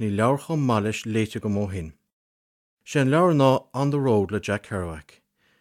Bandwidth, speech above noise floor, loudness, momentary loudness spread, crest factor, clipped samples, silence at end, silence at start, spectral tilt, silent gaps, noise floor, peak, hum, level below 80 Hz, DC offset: 15.5 kHz; over 67 dB; -23 LUFS; 12 LU; 18 dB; under 0.1%; 0.6 s; 0 s; -7 dB/octave; 2.12-2.77 s; under -90 dBFS; -6 dBFS; none; -54 dBFS; under 0.1%